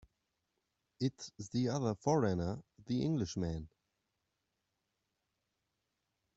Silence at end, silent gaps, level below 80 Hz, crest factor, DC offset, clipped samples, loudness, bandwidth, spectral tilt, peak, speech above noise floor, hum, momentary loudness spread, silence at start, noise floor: 2.7 s; none; -64 dBFS; 22 dB; under 0.1%; under 0.1%; -37 LUFS; 8 kHz; -6.5 dB/octave; -18 dBFS; 50 dB; none; 13 LU; 1 s; -86 dBFS